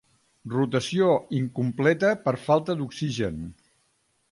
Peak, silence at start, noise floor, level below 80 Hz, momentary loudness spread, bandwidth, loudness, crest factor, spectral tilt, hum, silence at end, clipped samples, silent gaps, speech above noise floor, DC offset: -6 dBFS; 0.45 s; -70 dBFS; -56 dBFS; 9 LU; 11.5 kHz; -25 LUFS; 20 dB; -6.5 dB/octave; none; 0.8 s; under 0.1%; none; 45 dB; under 0.1%